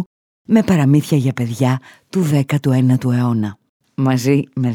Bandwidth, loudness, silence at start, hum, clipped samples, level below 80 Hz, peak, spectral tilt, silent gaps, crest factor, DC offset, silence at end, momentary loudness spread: 16.5 kHz; -16 LUFS; 0 s; none; under 0.1%; -54 dBFS; -2 dBFS; -7.5 dB/octave; 0.06-0.45 s, 3.69-3.80 s; 14 dB; under 0.1%; 0 s; 10 LU